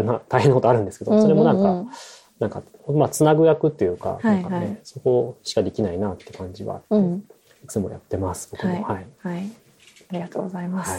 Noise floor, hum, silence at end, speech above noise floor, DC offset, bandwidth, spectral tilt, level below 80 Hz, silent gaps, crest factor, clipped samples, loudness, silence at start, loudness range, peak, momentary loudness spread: -53 dBFS; none; 0 s; 31 dB; under 0.1%; 16 kHz; -7 dB/octave; -56 dBFS; none; 20 dB; under 0.1%; -22 LUFS; 0 s; 9 LU; -2 dBFS; 16 LU